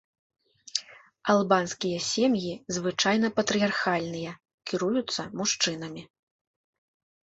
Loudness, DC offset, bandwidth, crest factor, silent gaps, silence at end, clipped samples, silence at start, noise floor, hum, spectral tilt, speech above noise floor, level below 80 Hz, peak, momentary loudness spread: -27 LUFS; under 0.1%; 8.2 kHz; 22 dB; 4.54-4.58 s; 1.15 s; under 0.1%; 0.75 s; -47 dBFS; none; -3.5 dB/octave; 20 dB; -68 dBFS; -8 dBFS; 12 LU